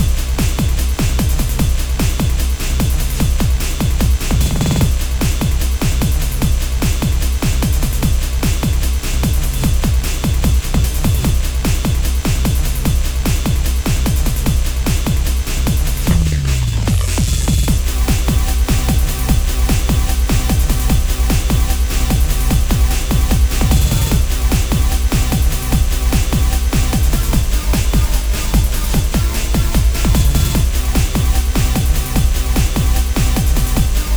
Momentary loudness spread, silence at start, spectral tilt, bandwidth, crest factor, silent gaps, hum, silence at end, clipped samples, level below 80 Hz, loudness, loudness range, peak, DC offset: 2 LU; 0 s; -5 dB/octave; over 20 kHz; 14 dB; none; none; 0 s; under 0.1%; -16 dBFS; -16 LUFS; 2 LU; 0 dBFS; 0.6%